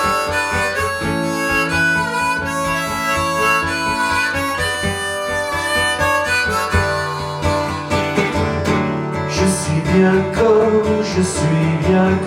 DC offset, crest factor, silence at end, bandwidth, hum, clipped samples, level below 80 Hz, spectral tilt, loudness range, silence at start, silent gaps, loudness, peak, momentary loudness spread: under 0.1%; 16 dB; 0 s; 17.5 kHz; none; under 0.1%; -40 dBFS; -4.5 dB/octave; 2 LU; 0 s; none; -17 LUFS; -2 dBFS; 5 LU